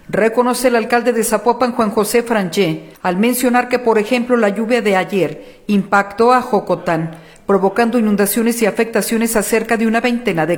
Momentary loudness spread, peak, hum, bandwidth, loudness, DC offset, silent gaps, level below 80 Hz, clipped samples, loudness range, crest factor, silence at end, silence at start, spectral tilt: 5 LU; 0 dBFS; none; 19 kHz; -15 LUFS; under 0.1%; none; -48 dBFS; under 0.1%; 1 LU; 16 dB; 0 s; 0.1 s; -4.5 dB/octave